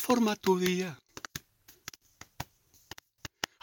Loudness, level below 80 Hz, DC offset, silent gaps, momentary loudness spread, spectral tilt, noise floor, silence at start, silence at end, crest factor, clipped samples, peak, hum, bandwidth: -31 LUFS; -64 dBFS; under 0.1%; none; 22 LU; -4.5 dB/octave; -60 dBFS; 0 s; 0.35 s; 22 dB; under 0.1%; -12 dBFS; none; 19 kHz